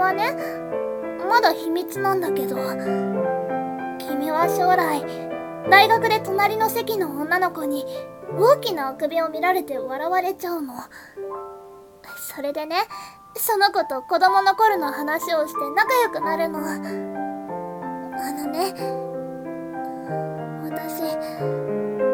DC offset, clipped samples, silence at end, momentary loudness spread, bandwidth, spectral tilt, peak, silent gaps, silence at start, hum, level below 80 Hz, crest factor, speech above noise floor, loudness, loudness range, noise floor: under 0.1%; under 0.1%; 0 s; 14 LU; 18 kHz; -4 dB/octave; -2 dBFS; none; 0 s; none; -64 dBFS; 22 dB; 22 dB; -22 LUFS; 9 LU; -44 dBFS